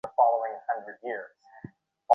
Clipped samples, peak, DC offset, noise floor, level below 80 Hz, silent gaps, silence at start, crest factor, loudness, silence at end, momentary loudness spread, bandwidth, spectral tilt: under 0.1%; -6 dBFS; under 0.1%; -49 dBFS; -76 dBFS; none; 0.05 s; 24 dB; -29 LUFS; 0 s; 24 LU; 3.4 kHz; -7 dB/octave